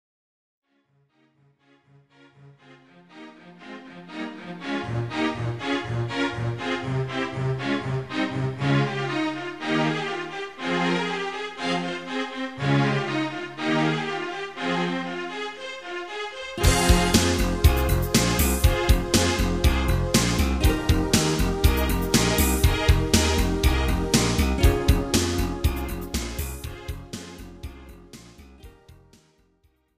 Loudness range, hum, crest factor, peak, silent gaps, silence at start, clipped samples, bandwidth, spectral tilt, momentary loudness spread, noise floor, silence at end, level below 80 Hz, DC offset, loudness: 11 LU; none; 22 dB; -4 dBFS; none; 2.4 s; under 0.1%; 15.5 kHz; -4.5 dB/octave; 14 LU; -67 dBFS; 1.05 s; -30 dBFS; 0.2%; -24 LUFS